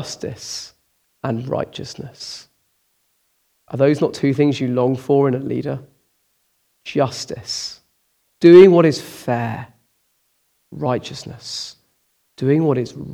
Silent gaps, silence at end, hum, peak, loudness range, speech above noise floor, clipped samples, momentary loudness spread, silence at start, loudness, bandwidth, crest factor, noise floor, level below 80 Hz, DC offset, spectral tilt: none; 0 s; none; 0 dBFS; 13 LU; 48 dB; under 0.1%; 19 LU; 0 s; -17 LUFS; 13 kHz; 20 dB; -66 dBFS; -60 dBFS; under 0.1%; -6.5 dB/octave